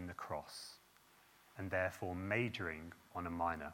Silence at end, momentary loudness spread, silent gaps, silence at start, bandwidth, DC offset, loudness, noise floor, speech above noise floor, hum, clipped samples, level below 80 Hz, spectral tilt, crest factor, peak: 0 s; 13 LU; none; 0 s; 17.5 kHz; under 0.1%; -42 LUFS; -68 dBFS; 27 dB; none; under 0.1%; -70 dBFS; -5.5 dB/octave; 20 dB; -22 dBFS